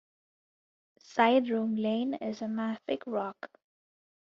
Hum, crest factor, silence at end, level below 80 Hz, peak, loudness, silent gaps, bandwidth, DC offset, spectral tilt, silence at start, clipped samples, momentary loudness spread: none; 22 dB; 0.85 s; -78 dBFS; -10 dBFS; -30 LUFS; none; 7.2 kHz; under 0.1%; -3.5 dB/octave; 1.1 s; under 0.1%; 13 LU